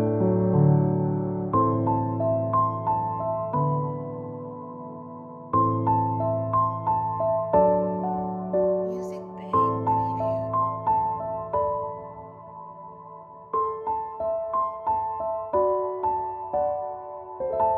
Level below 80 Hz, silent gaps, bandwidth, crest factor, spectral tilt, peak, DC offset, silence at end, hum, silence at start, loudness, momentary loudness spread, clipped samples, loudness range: -54 dBFS; none; 3.4 kHz; 18 dB; -11.5 dB/octave; -8 dBFS; under 0.1%; 0 s; none; 0 s; -25 LUFS; 16 LU; under 0.1%; 5 LU